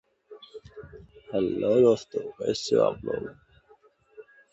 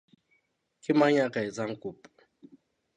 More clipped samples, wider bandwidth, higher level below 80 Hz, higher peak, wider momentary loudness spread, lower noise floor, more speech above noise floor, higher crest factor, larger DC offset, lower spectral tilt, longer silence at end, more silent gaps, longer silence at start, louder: neither; second, 8.2 kHz vs 10.5 kHz; first, -60 dBFS vs -76 dBFS; about the same, -10 dBFS vs -10 dBFS; first, 25 LU vs 18 LU; second, -60 dBFS vs -73 dBFS; second, 35 dB vs 46 dB; about the same, 20 dB vs 20 dB; neither; about the same, -5.5 dB/octave vs -6 dB/octave; second, 0.3 s vs 1 s; neither; second, 0.3 s vs 0.9 s; about the same, -26 LUFS vs -27 LUFS